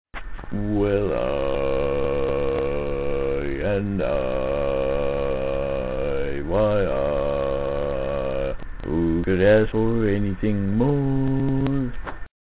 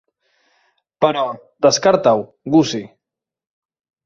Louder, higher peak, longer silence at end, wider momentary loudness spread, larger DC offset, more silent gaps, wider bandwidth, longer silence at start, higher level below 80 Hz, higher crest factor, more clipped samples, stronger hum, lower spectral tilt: second, -23 LUFS vs -17 LUFS; second, -6 dBFS vs -2 dBFS; second, 0.15 s vs 1.2 s; second, 6 LU vs 9 LU; first, 0.9% vs under 0.1%; neither; second, 4 kHz vs 7.6 kHz; second, 0.05 s vs 1 s; first, -34 dBFS vs -60 dBFS; about the same, 16 dB vs 18 dB; neither; neither; first, -11.5 dB/octave vs -4.5 dB/octave